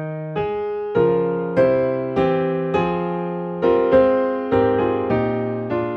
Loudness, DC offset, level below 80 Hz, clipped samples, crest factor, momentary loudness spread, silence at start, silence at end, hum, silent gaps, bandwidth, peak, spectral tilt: -20 LUFS; under 0.1%; -48 dBFS; under 0.1%; 14 dB; 9 LU; 0 s; 0 s; none; none; 6 kHz; -4 dBFS; -9.5 dB/octave